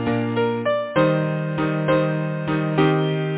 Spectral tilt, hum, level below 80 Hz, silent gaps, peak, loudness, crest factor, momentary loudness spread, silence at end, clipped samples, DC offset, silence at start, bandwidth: -11.5 dB/octave; none; -52 dBFS; none; -6 dBFS; -21 LUFS; 16 dB; 4 LU; 0 s; under 0.1%; under 0.1%; 0 s; 4 kHz